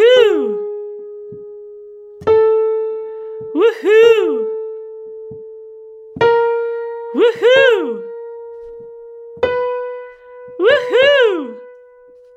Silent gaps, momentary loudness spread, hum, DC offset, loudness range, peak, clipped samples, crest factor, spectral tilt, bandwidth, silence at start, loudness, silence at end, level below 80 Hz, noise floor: none; 24 LU; none; under 0.1%; 4 LU; 0 dBFS; under 0.1%; 16 dB; -4.5 dB/octave; 8 kHz; 0 s; -14 LUFS; 0.65 s; -58 dBFS; -44 dBFS